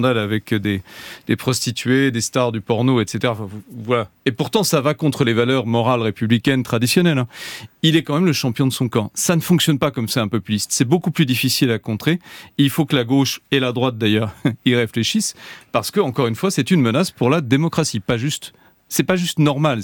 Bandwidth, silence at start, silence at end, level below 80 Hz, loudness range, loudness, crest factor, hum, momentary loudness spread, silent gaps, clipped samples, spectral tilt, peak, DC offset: 19 kHz; 0 s; 0 s; -56 dBFS; 2 LU; -18 LUFS; 16 dB; none; 7 LU; none; under 0.1%; -5 dB/octave; -2 dBFS; under 0.1%